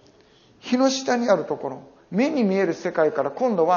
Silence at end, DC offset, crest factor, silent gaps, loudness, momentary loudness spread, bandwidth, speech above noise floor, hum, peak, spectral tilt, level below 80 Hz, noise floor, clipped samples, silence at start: 0 s; under 0.1%; 18 dB; none; -22 LUFS; 9 LU; 7.2 kHz; 33 dB; none; -4 dBFS; -4.5 dB/octave; -70 dBFS; -55 dBFS; under 0.1%; 0.65 s